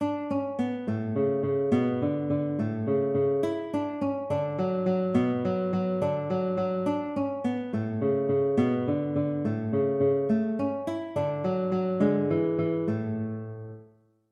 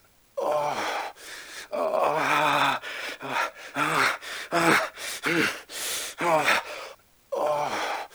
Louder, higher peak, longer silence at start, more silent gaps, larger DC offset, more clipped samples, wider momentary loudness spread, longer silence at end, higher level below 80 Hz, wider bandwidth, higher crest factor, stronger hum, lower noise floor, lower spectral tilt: about the same, -28 LUFS vs -26 LUFS; second, -12 dBFS vs -6 dBFS; second, 0 s vs 0.35 s; neither; neither; neither; second, 6 LU vs 14 LU; first, 0.45 s vs 0.05 s; about the same, -68 dBFS vs -68 dBFS; second, 10 kHz vs over 20 kHz; second, 16 dB vs 22 dB; neither; first, -58 dBFS vs -46 dBFS; first, -9.5 dB/octave vs -2.5 dB/octave